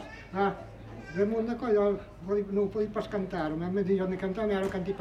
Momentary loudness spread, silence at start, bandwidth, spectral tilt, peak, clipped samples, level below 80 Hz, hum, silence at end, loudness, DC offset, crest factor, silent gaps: 10 LU; 0 s; 9.2 kHz; -8 dB/octave; -16 dBFS; under 0.1%; -52 dBFS; none; 0 s; -30 LUFS; under 0.1%; 14 dB; none